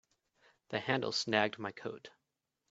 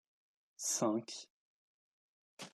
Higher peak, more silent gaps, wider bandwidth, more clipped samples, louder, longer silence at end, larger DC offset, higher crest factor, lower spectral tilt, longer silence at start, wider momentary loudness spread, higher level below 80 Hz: first, -12 dBFS vs -22 dBFS; second, none vs 1.30-2.37 s; second, 8 kHz vs 13.5 kHz; neither; about the same, -35 LUFS vs -37 LUFS; first, 0.6 s vs 0.05 s; neither; about the same, 26 dB vs 22 dB; about the same, -2.5 dB/octave vs -3 dB/octave; about the same, 0.7 s vs 0.6 s; second, 14 LU vs 19 LU; first, -80 dBFS vs under -90 dBFS